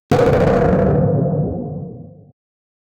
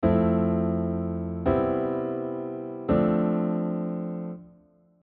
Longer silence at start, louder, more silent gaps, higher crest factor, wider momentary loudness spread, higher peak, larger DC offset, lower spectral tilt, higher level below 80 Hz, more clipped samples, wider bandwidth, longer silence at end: about the same, 0.1 s vs 0 s; first, -16 LUFS vs -27 LUFS; neither; about the same, 14 dB vs 16 dB; first, 15 LU vs 11 LU; first, -4 dBFS vs -10 dBFS; neither; about the same, -8.5 dB/octave vs -9.5 dB/octave; first, -32 dBFS vs -48 dBFS; neither; first, 10.5 kHz vs 4 kHz; first, 0.9 s vs 0.55 s